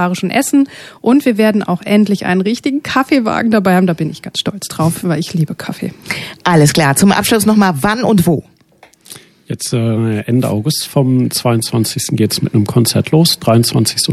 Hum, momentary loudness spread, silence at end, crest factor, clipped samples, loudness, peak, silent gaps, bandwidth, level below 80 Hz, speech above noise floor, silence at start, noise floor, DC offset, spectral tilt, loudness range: none; 9 LU; 0 s; 14 dB; under 0.1%; -13 LUFS; 0 dBFS; none; 15 kHz; -48 dBFS; 34 dB; 0 s; -47 dBFS; under 0.1%; -5 dB/octave; 4 LU